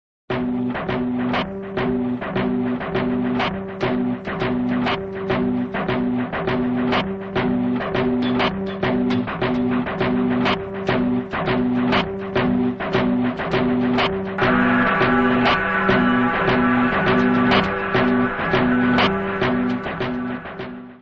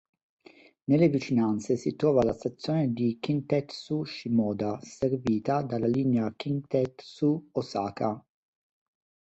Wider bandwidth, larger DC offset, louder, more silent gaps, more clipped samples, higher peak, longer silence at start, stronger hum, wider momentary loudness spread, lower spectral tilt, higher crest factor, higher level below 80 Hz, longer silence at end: second, 6.4 kHz vs 8.2 kHz; neither; first, -20 LUFS vs -28 LUFS; neither; neither; first, -4 dBFS vs -10 dBFS; second, 0.3 s vs 0.9 s; neither; about the same, 7 LU vs 9 LU; about the same, -7.5 dB/octave vs -7.5 dB/octave; about the same, 16 dB vs 18 dB; first, -42 dBFS vs -62 dBFS; second, 0.05 s vs 1.1 s